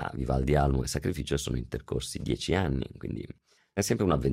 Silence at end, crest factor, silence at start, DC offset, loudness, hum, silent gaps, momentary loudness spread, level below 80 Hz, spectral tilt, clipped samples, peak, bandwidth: 0 s; 16 dB; 0 s; under 0.1%; -30 LUFS; none; none; 12 LU; -38 dBFS; -5.5 dB/octave; under 0.1%; -14 dBFS; 16 kHz